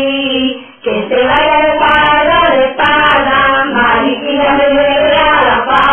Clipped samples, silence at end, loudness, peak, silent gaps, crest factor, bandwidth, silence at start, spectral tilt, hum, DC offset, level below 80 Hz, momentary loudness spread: under 0.1%; 0 s; -9 LUFS; 0 dBFS; none; 10 dB; 4.9 kHz; 0 s; -6 dB/octave; none; under 0.1%; -34 dBFS; 6 LU